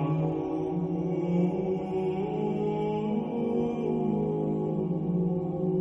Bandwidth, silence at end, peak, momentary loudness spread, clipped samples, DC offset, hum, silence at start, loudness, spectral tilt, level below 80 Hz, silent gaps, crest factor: 6 kHz; 0 s; -16 dBFS; 2 LU; under 0.1%; under 0.1%; none; 0 s; -29 LUFS; -10.5 dB/octave; -56 dBFS; none; 12 dB